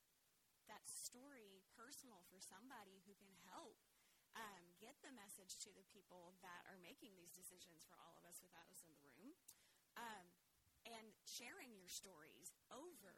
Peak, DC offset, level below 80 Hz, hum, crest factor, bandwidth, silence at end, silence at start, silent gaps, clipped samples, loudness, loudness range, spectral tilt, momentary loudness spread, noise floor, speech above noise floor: -40 dBFS; under 0.1%; under -90 dBFS; none; 24 dB; 17 kHz; 0 s; 0 s; none; under 0.1%; -60 LUFS; 4 LU; -1.5 dB/octave; 11 LU; -82 dBFS; 20 dB